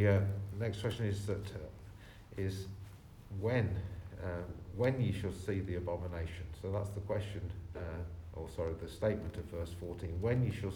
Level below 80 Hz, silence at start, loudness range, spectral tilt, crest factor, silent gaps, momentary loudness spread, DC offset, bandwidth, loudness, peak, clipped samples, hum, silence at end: -52 dBFS; 0 s; 3 LU; -7.5 dB/octave; 18 dB; none; 14 LU; under 0.1%; 13.5 kHz; -39 LUFS; -18 dBFS; under 0.1%; none; 0 s